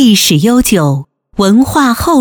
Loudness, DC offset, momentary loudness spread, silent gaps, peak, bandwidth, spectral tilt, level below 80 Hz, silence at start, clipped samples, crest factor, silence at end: -9 LUFS; 0.1%; 8 LU; none; 0 dBFS; over 20 kHz; -4.5 dB/octave; -32 dBFS; 0 s; under 0.1%; 8 dB; 0 s